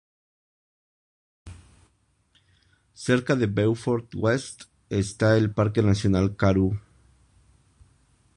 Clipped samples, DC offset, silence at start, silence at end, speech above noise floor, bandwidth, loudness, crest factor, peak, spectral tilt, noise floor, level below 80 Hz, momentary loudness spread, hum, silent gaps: under 0.1%; under 0.1%; 1.45 s; 1.55 s; 44 dB; 11 kHz; -24 LUFS; 22 dB; -6 dBFS; -7 dB/octave; -67 dBFS; -46 dBFS; 9 LU; none; none